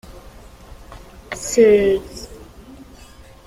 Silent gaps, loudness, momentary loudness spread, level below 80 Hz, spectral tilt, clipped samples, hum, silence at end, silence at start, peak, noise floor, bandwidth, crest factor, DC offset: none; -16 LUFS; 23 LU; -42 dBFS; -4.5 dB/octave; under 0.1%; none; 1.1 s; 0.1 s; -2 dBFS; -43 dBFS; 15.5 kHz; 18 dB; under 0.1%